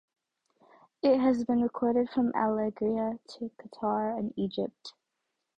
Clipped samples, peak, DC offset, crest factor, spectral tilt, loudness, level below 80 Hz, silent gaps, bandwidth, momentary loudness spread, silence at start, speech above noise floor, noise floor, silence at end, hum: under 0.1%; -14 dBFS; under 0.1%; 16 dB; -7.5 dB/octave; -29 LUFS; -66 dBFS; none; 8 kHz; 15 LU; 1.05 s; 54 dB; -83 dBFS; 0.65 s; none